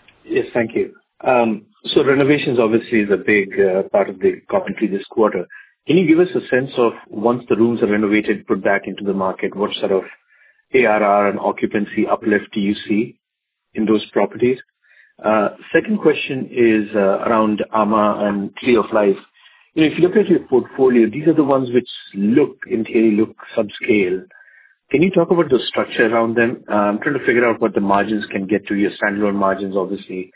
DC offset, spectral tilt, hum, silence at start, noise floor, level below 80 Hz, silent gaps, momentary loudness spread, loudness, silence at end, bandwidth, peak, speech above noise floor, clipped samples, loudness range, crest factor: under 0.1%; -10.5 dB/octave; none; 0.25 s; -78 dBFS; -56 dBFS; none; 7 LU; -17 LUFS; 0.1 s; 4 kHz; 0 dBFS; 62 dB; under 0.1%; 3 LU; 16 dB